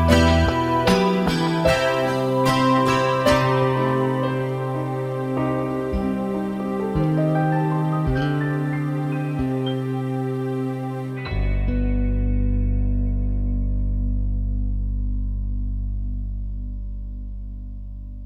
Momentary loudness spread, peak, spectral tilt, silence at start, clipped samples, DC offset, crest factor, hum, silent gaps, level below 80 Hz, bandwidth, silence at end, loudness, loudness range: 12 LU; -4 dBFS; -6.5 dB/octave; 0 s; under 0.1%; under 0.1%; 18 dB; none; none; -28 dBFS; 15 kHz; 0 s; -22 LUFS; 8 LU